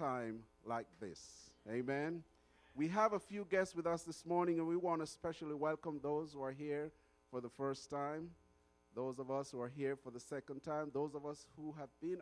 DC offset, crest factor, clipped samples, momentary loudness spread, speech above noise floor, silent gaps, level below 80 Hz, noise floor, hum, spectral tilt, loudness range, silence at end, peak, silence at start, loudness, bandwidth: under 0.1%; 22 dB; under 0.1%; 13 LU; 31 dB; none; -76 dBFS; -73 dBFS; none; -6 dB/octave; 6 LU; 0 s; -22 dBFS; 0 s; -43 LUFS; 11 kHz